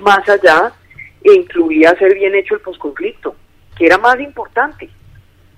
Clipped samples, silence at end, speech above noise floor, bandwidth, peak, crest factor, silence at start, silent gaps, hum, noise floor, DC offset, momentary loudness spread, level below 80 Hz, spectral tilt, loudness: 0.4%; 0.7 s; 32 dB; 12.5 kHz; 0 dBFS; 12 dB; 0 s; none; none; -43 dBFS; under 0.1%; 13 LU; -48 dBFS; -4.5 dB/octave; -12 LUFS